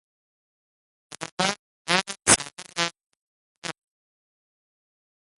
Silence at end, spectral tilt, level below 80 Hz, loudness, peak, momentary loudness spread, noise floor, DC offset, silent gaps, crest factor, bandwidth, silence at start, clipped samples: 1.7 s; -1 dB/octave; -58 dBFS; -23 LUFS; 0 dBFS; 18 LU; under -90 dBFS; under 0.1%; 1.32-1.37 s, 1.59-1.85 s, 3.17-3.62 s; 30 dB; 16 kHz; 1.1 s; under 0.1%